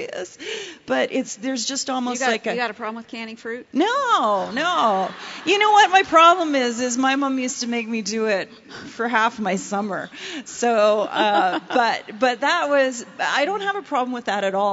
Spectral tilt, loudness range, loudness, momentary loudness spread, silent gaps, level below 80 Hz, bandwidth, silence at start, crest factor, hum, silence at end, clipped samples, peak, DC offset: -2.5 dB/octave; 7 LU; -20 LUFS; 16 LU; none; -68 dBFS; 8 kHz; 0 s; 18 dB; none; 0 s; under 0.1%; -2 dBFS; under 0.1%